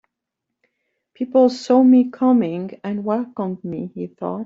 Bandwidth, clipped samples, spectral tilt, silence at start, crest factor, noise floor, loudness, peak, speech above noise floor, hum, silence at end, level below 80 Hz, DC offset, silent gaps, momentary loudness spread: 7.6 kHz; under 0.1%; -7.5 dB/octave; 1.2 s; 16 dB; -81 dBFS; -19 LUFS; -4 dBFS; 63 dB; none; 0 s; -68 dBFS; under 0.1%; none; 15 LU